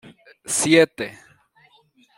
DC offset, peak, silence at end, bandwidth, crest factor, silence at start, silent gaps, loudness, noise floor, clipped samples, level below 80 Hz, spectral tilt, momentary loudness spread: under 0.1%; -2 dBFS; 1.1 s; 16.5 kHz; 22 dB; 0.5 s; none; -18 LUFS; -58 dBFS; under 0.1%; -66 dBFS; -3 dB/octave; 17 LU